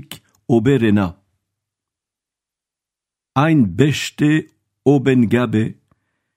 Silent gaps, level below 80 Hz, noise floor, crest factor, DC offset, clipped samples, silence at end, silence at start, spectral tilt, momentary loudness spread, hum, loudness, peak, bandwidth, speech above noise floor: none; -52 dBFS; -87 dBFS; 18 dB; under 0.1%; under 0.1%; 0.65 s; 0.1 s; -7 dB/octave; 10 LU; none; -17 LUFS; 0 dBFS; 15.5 kHz; 72 dB